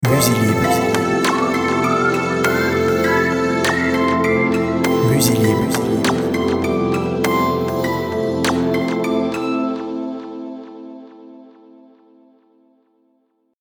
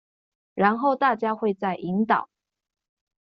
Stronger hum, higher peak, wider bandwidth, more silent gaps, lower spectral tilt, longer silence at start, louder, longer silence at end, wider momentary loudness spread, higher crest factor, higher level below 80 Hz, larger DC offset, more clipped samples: neither; first, 0 dBFS vs -4 dBFS; first, over 20 kHz vs 5.8 kHz; neither; about the same, -5 dB/octave vs -5 dB/octave; second, 0 s vs 0.55 s; first, -17 LUFS vs -24 LUFS; first, 2.2 s vs 0.95 s; first, 11 LU vs 5 LU; about the same, 18 dB vs 22 dB; first, -46 dBFS vs -70 dBFS; neither; neither